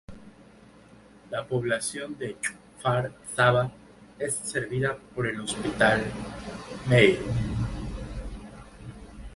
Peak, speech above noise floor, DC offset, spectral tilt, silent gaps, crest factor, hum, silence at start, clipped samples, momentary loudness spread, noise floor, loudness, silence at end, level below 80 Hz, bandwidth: -4 dBFS; 26 dB; under 0.1%; -5 dB/octave; none; 24 dB; none; 0.1 s; under 0.1%; 18 LU; -53 dBFS; -27 LUFS; 0 s; -44 dBFS; 11.5 kHz